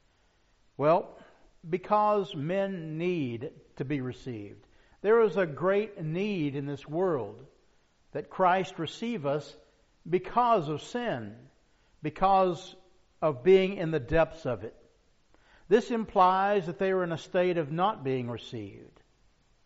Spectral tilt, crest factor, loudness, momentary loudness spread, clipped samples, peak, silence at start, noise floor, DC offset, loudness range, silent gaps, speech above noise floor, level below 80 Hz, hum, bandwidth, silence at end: -5 dB/octave; 20 dB; -29 LUFS; 16 LU; under 0.1%; -8 dBFS; 0.8 s; -67 dBFS; under 0.1%; 4 LU; none; 39 dB; -56 dBFS; none; 7.6 kHz; 0.8 s